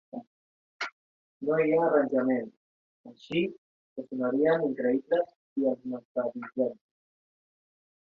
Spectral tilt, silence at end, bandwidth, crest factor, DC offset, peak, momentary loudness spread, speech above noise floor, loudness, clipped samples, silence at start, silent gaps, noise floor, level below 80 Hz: -7.5 dB/octave; 1.35 s; 7 kHz; 20 dB; under 0.1%; -10 dBFS; 14 LU; over 62 dB; -29 LUFS; under 0.1%; 0.15 s; 0.27-0.80 s, 0.92-1.40 s, 2.57-3.04 s, 3.58-3.96 s, 5.36-5.56 s, 6.05-6.15 s; under -90 dBFS; -74 dBFS